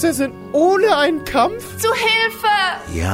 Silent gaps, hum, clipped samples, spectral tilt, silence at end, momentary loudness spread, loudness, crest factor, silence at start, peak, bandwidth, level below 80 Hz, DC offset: none; none; under 0.1%; -4 dB/octave; 0 s; 7 LU; -17 LUFS; 14 dB; 0 s; -4 dBFS; 16 kHz; -40 dBFS; under 0.1%